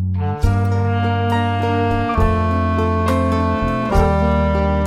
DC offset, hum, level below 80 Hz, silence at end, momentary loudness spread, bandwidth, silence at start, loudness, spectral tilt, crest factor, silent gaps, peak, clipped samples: under 0.1%; none; -24 dBFS; 0 s; 2 LU; 12 kHz; 0 s; -18 LUFS; -8 dB/octave; 14 dB; none; -2 dBFS; under 0.1%